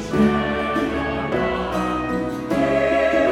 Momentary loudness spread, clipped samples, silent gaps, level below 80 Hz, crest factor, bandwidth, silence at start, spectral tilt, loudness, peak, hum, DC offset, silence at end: 6 LU; under 0.1%; none; -38 dBFS; 14 dB; 14 kHz; 0 s; -6.5 dB/octave; -21 LUFS; -6 dBFS; none; under 0.1%; 0 s